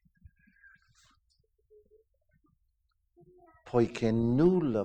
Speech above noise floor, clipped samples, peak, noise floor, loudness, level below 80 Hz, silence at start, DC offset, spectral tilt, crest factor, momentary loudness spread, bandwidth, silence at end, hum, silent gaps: 48 dB; under 0.1%; -14 dBFS; -76 dBFS; -28 LUFS; -56 dBFS; 3.65 s; under 0.1%; -8.5 dB/octave; 20 dB; 4 LU; 8.6 kHz; 0 s; none; none